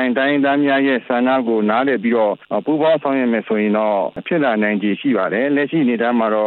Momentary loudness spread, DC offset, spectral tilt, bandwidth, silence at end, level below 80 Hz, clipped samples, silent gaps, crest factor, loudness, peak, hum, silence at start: 3 LU; under 0.1%; -10 dB/octave; 4.3 kHz; 0 s; -66 dBFS; under 0.1%; none; 12 dB; -17 LUFS; -4 dBFS; none; 0 s